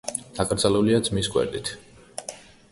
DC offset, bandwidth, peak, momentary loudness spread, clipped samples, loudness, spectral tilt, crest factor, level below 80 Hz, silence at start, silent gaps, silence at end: under 0.1%; 12 kHz; -4 dBFS; 18 LU; under 0.1%; -24 LUFS; -4.5 dB/octave; 20 dB; -48 dBFS; 0.05 s; none; 0.3 s